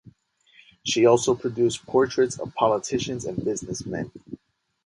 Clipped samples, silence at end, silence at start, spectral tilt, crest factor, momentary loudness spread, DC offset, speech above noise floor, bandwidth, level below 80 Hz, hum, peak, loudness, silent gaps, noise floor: under 0.1%; 0.5 s; 0.85 s; -4.5 dB/octave; 18 dB; 15 LU; under 0.1%; 36 dB; 11.5 kHz; -56 dBFS; none; -6 dBFS; -24 LUFS; none; -60 dBFS